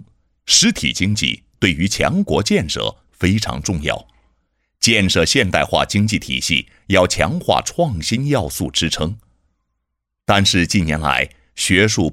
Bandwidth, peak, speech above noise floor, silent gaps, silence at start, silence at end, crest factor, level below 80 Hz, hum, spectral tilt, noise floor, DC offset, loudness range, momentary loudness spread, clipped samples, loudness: 16.5 kHz; 0 dBFS; 59 dB; none; 0 s; 0 s; 18 dB; -38 dBFS; none; -3.5 dB/octave; -76 dBFS; under 0.1%; 3 LU; 8 LU; under 0.1%; -17 LUFS